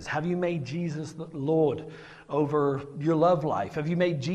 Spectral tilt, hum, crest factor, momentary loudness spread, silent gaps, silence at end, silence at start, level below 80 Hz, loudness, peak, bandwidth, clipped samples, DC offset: -7.5 dB/octave; none; 16 dB; 13 LU; none; 0 s; 0 s; -62 dBFS; -28 LUFS; -12 dBFS; 9.2 kHz; under 0.1%; under 0.1%